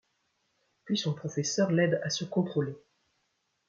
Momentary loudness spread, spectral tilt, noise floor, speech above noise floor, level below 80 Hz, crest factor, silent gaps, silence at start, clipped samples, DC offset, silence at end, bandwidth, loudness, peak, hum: 7 LU; -5 dB/octave; -77 dBFS; 48 dB; -74 dBFS; 18 dB; none; 0.85 s; under 0.1%; under 0.1%; 0.9 s; 7.6 kHz; -30 LUFS; -14 dBFS; none